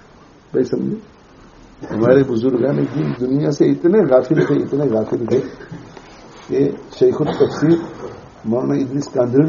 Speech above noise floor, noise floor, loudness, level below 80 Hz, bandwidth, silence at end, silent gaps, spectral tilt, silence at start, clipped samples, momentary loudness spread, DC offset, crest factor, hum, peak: 29 dB; -45 dBFS; -17 LUFS; -50 dBFS; 7.2 kHz; 0 s; none; -8 dB/octave; 0.55 s; under 0.1%; 17 LU; under 0.1%; 18 dB; none; 0 dBFS